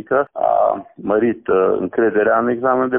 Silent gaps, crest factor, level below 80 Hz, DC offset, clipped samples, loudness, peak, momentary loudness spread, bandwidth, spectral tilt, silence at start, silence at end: none; 12 dB; -56 dBFS; under 0.1%; under 0.1%; -17 LUFS; -4 dBFS; 4 LU; 3.6 kHz; -1 dB/octave; 0.1 s; 0 s